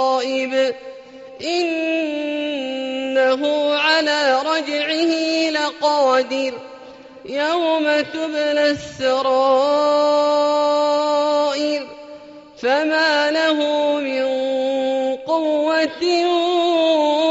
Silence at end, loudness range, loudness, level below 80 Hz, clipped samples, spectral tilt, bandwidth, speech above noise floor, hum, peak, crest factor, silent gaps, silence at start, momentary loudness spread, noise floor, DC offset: 0 s; 3 LU; -18 LUFS; -62 dBFS; under 0.1%; 0 dB/octave; 8 kHz; 22 dB; none; -4 dBFS; 14 dB; none; 0 s; 8 LU; -40 dBFS; under 0.1%